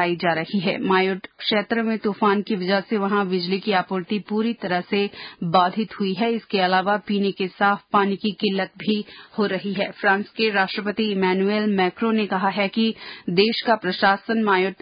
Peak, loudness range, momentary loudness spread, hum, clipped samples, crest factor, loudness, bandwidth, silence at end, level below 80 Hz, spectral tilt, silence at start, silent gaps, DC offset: -6 dBFS; 2 LU; 6 LU; none; under 0.1%; 16 dB; -22 LUFS; 5.2 kHz; 0.05 s; -66 dBFS; -10.5 dB/octave; 0 s; none; under 0.1%